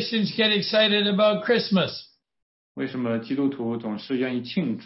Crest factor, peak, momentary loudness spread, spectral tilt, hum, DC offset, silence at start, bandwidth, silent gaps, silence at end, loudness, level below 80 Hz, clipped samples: 16 dB; -10 dBFS; 11 LU; -8.5 dB/octave; none; under 0.1%; 0 s; 6 kHz; 2.42-2.75 s; 0 s; -23 LUFS; -70 dBFS; under 0.1%